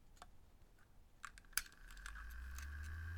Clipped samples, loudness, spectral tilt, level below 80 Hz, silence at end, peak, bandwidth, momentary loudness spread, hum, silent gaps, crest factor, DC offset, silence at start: under 0.1%; -50 LUFS; -1.5 dB/octave; -56 dBFS; 0 s; -18 dBFS; 19 kHz; 19 LU; none; none; 34 dB; under 0.1%; 0 s